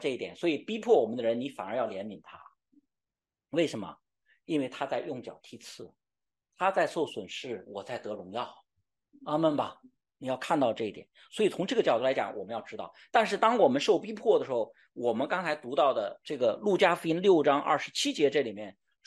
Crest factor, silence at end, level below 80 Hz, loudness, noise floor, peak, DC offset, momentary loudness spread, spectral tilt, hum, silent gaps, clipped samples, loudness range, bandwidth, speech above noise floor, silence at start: 20 dB; 0.35 s; -80 dBFS; -29 LUFS; under -90 dBFS; -10 dBFS; under 0.1%; 17 LU; -4.5 dB/octave; none; none; under 0.1%; 9 LU; 12 kHz; over 61 dB; 0 s